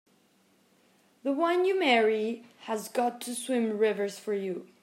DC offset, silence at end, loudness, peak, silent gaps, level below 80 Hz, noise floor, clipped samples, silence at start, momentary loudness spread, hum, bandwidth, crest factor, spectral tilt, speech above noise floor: under 0.1%; 0.15 s; -29 LUFS; -10 dBFS; none; -90 dBFS; -66 dBFS; under 0.1%; 1.25 s; 12 LU; none; 16 kHz; 20 dB; -4 dB/octave; 38 dB